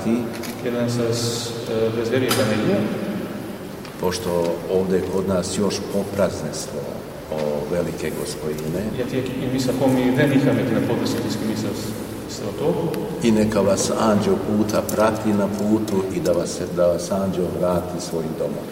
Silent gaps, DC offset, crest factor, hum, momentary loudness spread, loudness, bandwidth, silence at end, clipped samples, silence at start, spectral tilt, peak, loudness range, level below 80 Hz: none; under 0.1%; 18 dB; none; 9 LU; -22 LUFS; 16 kHz; 0 s; under 0.1%; 0 s; -5.5 dB/octave; -4 dBFS; 4 LU; -48 dBFS